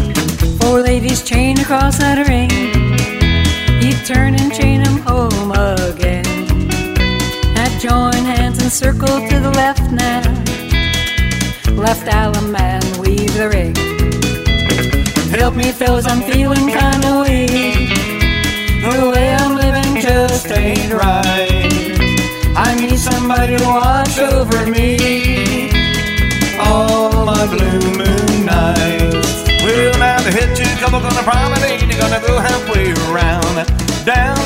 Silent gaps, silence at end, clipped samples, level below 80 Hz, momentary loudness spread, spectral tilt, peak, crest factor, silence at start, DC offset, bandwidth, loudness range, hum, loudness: none; 0 s; under 0.1%; -20 dBFS; 3 LU; -5 dB/octave; 0 dBFS; 12 dB; 0 s; under 0.1%; 16.5 kHz; 2 LU; none; -13 LUFS